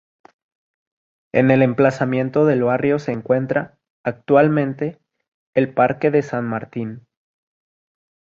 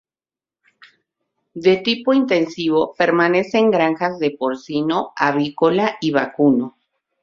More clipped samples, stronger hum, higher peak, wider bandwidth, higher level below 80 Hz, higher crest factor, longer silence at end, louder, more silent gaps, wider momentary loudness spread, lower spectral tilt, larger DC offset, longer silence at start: neither; neither; about the same, -2 dBFS vs -2 dBFS; about the same, 7.6 kHz vs 7.4 kHz; about the same, -60 dBFS vs -62 dBFS; about the same, 18 dB vs 16 dB; first, 1.3 s vs 0.55 s; about the same, -19 LUFS vs -18 LUFS; first, 3.90-4.04 s, 5.28-5.53 s vs none; first, 13 LU vs 5 LU; first, -8.5 dB/octave vs -6 dB/octave; neither; second, 1.35 s vs 1.55 s